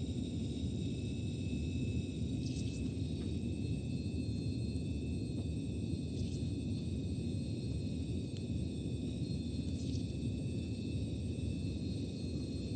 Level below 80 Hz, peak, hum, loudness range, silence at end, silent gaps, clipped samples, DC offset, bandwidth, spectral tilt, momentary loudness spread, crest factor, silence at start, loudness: -48 dBFS; -24 dBFS; none; 1 LU; 0 s; none; under 0.1%; under 0.1%; 9.2 kHz; -7 dB/octave; 1 LU; 14 dB; 0 s; -39 LUFS